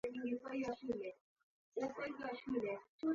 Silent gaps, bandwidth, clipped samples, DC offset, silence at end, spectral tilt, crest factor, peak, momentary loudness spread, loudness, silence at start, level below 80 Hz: 1.21-1.36 s, 1.43-1.72 s, 2.89-2.99 s; 7.4 kHz; under 0.1%; under 0.1%; 0 s; -4.5 dB/octave; 16 dB; -28 dBFS; 4 LU; -44 LUFS; 0.05 s; -76 dBFS